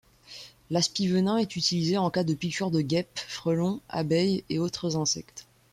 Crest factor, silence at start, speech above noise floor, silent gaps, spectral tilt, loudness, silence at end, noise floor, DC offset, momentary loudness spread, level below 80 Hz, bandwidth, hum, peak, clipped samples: 16 dB; 0.3 s; 21 dB; none; -5 dB/octave; -27 LUFS; 0.3 s; -48 dBFS; under 0.1%; 16 LU; -62 dBFS; 14 kHz; none; -12 dBFS; under 0.1%